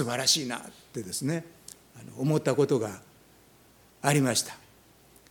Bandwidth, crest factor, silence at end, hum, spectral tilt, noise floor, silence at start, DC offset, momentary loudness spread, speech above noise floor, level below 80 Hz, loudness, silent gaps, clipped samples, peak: 19 kHz; 22 dB; 0.75 s; none; -4 dB/octave; -58 dBFS; 0 s; under 0.1%; 23 LU; 31 dB; -68 dBFS; -28 LUFS; none; under 0.1%; -8 dBFS